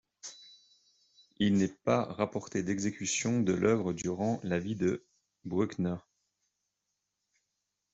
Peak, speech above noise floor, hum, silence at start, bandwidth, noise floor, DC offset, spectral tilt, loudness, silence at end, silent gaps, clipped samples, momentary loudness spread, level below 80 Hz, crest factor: -12 dBFS; 54 dB; none; 0.25 s; 8.2 kHz; -84 dBFS; under 0.1%; -5.5 dB/octave; -32 LUFS; 1.95 s; none; under 0.1%; 14 LU; -68 dBFS; 22 dB